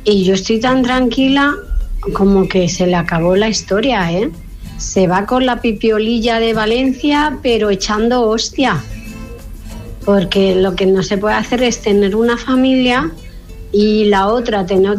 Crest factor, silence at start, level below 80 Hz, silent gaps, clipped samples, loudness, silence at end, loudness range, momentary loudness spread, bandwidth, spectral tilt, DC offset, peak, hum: 12 dB; 0 s; -30 dBFS; none; under 0.1%; -14 LUFS; 0 s; 2 LU; 10 LU; 14.5 kHz; -5 dB/octave; under 0.1%; -2 dBFS; none